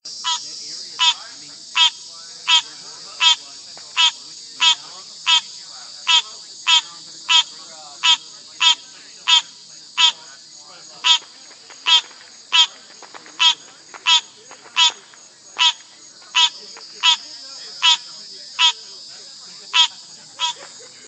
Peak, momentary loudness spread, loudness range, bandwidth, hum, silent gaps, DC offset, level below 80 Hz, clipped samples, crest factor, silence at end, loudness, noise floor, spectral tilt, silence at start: 0 dBFS; 20 LU; 2 LU; 9.4 kHz; none; none; under 0.1%; -90 dBFS; under 0.1%; 22 dB; 0.4 s; -16 LUFS; -45 dBFS; 4 dB/octave; 0.05 s